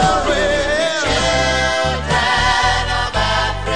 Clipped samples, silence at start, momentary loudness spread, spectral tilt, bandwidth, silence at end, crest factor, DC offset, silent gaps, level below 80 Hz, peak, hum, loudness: under 0.1%; 0 s; 3 LU; -3.5 dB/octave; 10.5 kHz; 0 s; 14 dB; 0.9%; none; -28 dBFS; -2 dBFS; none; -16 LUFS